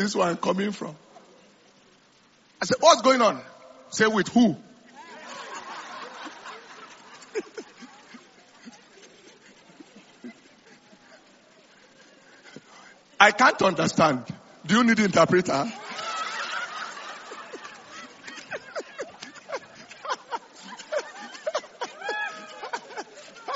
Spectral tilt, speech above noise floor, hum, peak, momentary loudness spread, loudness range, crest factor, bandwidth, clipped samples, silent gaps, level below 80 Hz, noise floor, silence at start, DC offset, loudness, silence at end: -3 dB/octave; 38 dB; none; -2 dBFS; 24 LU; 19 LU; 26 dB; 8 kHz; under 0.1%; none; -68 dBFS; -59 dBFS; 0 s; under 0.1%; -24 LUFS; 0 s